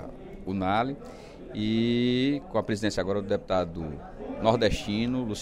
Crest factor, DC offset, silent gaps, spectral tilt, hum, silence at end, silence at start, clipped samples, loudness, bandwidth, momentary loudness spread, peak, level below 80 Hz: 20 dB; under 0.1%; none; -6 dB/octave; none; 0 s; 0 s; under 0.1%; -28 LUFS; 12 kHz; 15 LU; -8 dBFS; -46 dBFS